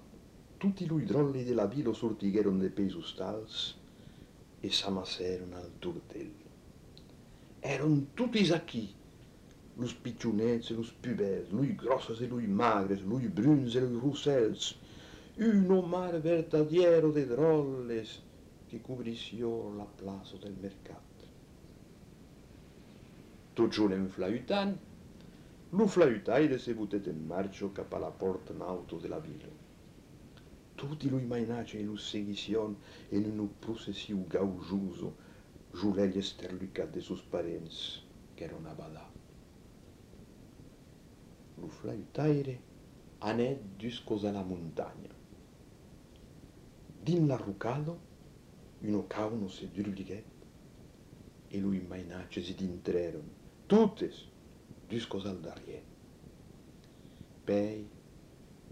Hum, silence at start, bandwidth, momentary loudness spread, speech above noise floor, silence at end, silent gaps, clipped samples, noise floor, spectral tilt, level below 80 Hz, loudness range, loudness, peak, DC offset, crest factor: none; 0 s; 13 kHz; 23 LU; 23 dB; 0 s; none; under 0.1%; -56 dBFS; -6.5 dB/octave; -62 dBFS; 12 LU; -34 LUFS; -12 dBFS; under 0.1%; 22 dB